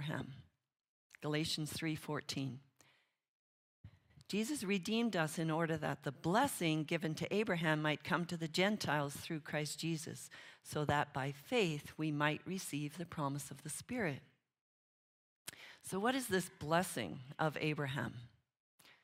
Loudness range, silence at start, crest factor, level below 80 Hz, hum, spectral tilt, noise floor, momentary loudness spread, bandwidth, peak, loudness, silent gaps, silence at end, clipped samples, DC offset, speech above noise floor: 7 LU; 0 s; 22 dB; -72 dBFS; none; -4.5 dB/octave; -75 dBFS; 11 LU; 16 kHz; -18 dBFS; -39 LUFS; 0.88-1.10 s, 3.28-3.84 s, 14.61-15.45 s, 18.60-18.78 s; 0.15 s; under 0.1%; under 0.1%; 36 dB